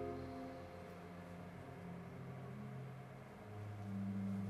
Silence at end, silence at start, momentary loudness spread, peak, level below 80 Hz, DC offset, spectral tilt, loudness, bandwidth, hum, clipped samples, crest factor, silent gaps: 0 s; 0 s; 9 LU; -34 dBFS; -70 dBFS; under 0.1%; -8 dB/octave; -50 LUFS; 13 kHz; none; under 0.1%; 14 dB; none